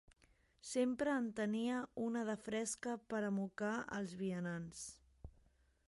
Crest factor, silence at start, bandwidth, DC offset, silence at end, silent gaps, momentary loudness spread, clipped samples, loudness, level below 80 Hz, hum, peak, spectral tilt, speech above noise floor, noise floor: 18 dB; 0.65 s; 11.5 kHz; under 0.1%; 0.6 s; none; 14 LU; under 0.1%; -41 LUFS; -70 dBFS; none; -24 dBFS; -5 dB/octave; 32 dB; -73 dBFS